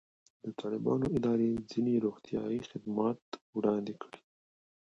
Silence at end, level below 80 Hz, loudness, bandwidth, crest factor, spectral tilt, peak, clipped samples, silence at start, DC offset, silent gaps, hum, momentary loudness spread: 0.7 s; -64 dBFS; -33 LUFS; 7.8 kHz; 18 dB; -8 dB/octave; -16 dBFS; under 0.1%; 0.45 s; under 0.1%; 3.22-3.32 s, 3.41-3.53 s; none; 13 LU